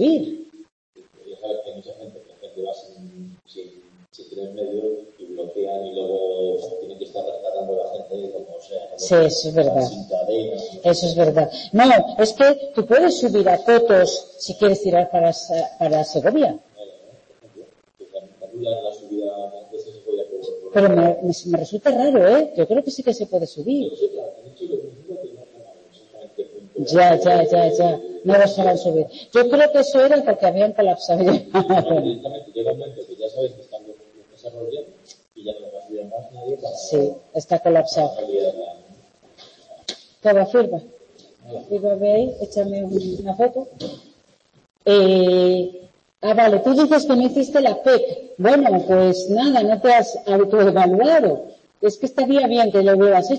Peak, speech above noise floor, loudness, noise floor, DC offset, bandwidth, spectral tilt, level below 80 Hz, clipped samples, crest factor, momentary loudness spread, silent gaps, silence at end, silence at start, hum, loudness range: -4 dBFS; 41 dB; -18 LUFS; -58 dBFS; under 0.1%; 8.6 kHz; -5.5 dB/octave; -60 dBFS; under 0.1%; 16 dB; 19 LU; 0.72-0.93 s; 0 s; 0 s; none; 14 LU